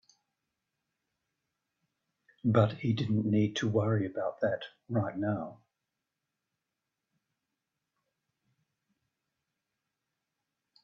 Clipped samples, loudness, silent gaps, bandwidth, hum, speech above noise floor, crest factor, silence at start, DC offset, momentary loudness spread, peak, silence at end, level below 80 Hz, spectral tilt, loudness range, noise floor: under 0.1%; -31 LUFS; none; 7.2 kHz; none; 57 dB; 22 dB; 2.45 s; under 0.1%; 8 LU; -12 dBFS; 5.3 s; -72 dBFS; -7.5 dB/octave; 9 LU; -87 dBFS